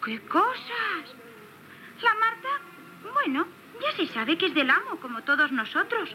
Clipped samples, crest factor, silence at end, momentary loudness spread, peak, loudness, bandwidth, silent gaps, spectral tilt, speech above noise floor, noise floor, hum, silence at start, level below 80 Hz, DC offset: under 0.1%; 18 dB; 0 s; 17 LU; -10 dBFS; -26 LUFS; 16 kHz; none; -4 dB/octave; 22 dB; -48 dBFS; none; 0 s; under -90 dBFS; under 0.1%